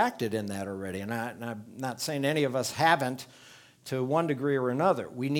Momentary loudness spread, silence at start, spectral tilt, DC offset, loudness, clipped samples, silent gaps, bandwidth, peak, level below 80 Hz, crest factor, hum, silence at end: 12 LU; 0 s; -5 dB/octave; under 0.1%; -29 LUFS; under 0.1%; none; 19.5 kHz; -8 dBFS; -76 dBFS; 22 dB; none; 0 s